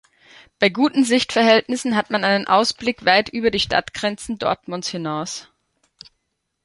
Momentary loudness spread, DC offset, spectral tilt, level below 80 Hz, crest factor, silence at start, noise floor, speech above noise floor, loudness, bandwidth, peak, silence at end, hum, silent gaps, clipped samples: 10 LU; under 0.1%; -3.5 dB/octave; -54 dBFS; 20 dB; 0.6 s; -75 dBFS; 55 dB; -19 LUFS; 11.5 kHz; 0 dBFS; 1.25 s; none; none; under 0.1%